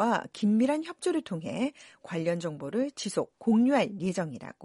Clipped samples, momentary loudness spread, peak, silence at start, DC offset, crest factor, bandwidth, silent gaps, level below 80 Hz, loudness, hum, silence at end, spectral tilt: under 0.1%; 9 LU; -14 dBFS; 0 s; under 0.1%; 16 dB; 11.5 kHz; none; -72 dBFS; -29 LUFS; none; 0 s; -6 dB/octave